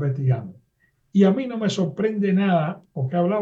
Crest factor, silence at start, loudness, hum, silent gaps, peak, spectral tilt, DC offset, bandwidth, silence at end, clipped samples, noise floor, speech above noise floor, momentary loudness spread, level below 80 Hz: 16 dB; 0 s; -22 LUFS; none; none; -6 dBFS; -7.5 dB/octave; under 0.1%; 7.8 kHz; 0 s; under 0.1%; -66 dBFS; 45 dB; 9 LU; -64 dBFS